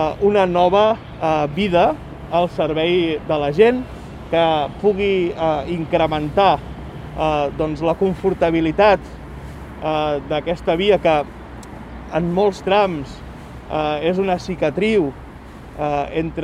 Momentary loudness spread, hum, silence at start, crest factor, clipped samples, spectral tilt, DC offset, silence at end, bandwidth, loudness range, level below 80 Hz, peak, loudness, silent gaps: 19 LU; none; 0 s; 18 dB; under 0.1%; -7 dB/octave; under 0.1%; 0 s; 11 kHz; 3 LU; -40 dBFS; -2 dBFS; -18 LUFS; none